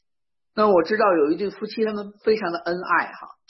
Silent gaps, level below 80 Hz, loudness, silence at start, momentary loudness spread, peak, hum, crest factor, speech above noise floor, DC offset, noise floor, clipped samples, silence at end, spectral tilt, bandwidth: none; -64 dBFS; -22 LUFS; 0.55 s; 9 LU; -6 dBFS; none; 16 dB; 67 dB; under 0.1%; -89 dBFS; under 0.1%; 0.2 s; -7.5 dB/octave; 6 kHz